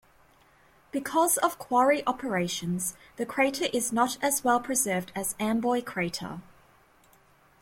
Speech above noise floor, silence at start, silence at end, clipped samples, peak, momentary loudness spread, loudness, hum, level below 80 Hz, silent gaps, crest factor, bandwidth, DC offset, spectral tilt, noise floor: 33 dB; 0.95 s; 1.2 s; under 0.1%; -10 dBFS; 10 LU; -27 LUFS; none; -64 dBFS; none; 18 dB; 16.5 kHz; under 0.1%; -3.5 dB/octave; -61 dBFS